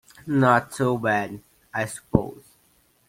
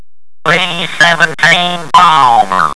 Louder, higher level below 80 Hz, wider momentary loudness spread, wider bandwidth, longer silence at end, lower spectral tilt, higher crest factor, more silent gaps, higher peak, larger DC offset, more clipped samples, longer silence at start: second, -23 LUFS vs -8 LUFS; about the same, -50 dBFS vs -46 dBFS; first, 15 LU vs 6 LU; first, 16.5 kHz vs 11 kHz; first, 0.7 s vs 0 s; first, -6.5 dB/octave vs -2.5 dB/octave; first, 24 dB vs 10 dB; neither; about the same, 0 dBFS vs 0 dBFS; second, under 0.1% vs 5%; second, under 0.1% vs 3%; second, 0.25 s vs 0.45 s